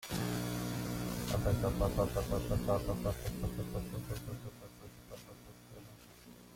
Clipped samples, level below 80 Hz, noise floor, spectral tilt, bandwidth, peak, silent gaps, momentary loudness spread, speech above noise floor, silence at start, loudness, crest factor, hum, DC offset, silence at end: under 0.1%; -46 dBFS; -56 dBFS; -6 dB/octave; 16.5 kHz; -20 dBFS; none; 20 LU; 21 dB; 0 s; -37 LUFS; 18 dB; none; under 0.1%; 0 s